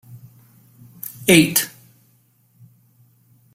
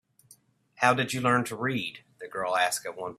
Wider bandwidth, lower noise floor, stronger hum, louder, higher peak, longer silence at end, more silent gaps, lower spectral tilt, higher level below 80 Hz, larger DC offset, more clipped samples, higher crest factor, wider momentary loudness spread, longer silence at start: about the same, 16.5 kHz vs 15 kHz; about the same, -59 dBFS vs -61 dBFS; neither; first, -16 LUFS vs -27 LUFS; first, 0 dBFS vs -6 dBFS; first, 1.85 s vs 0.05 s; neither; about the same, -3.5 dB/octave vs -4 dB/octave; first, -60 dBFS vs -68 dBFS; neither; neither; about the same, 24 dB vs 24 dB; first, 21 LU vs 12 LU; second, 0.15 s vs 0.8 s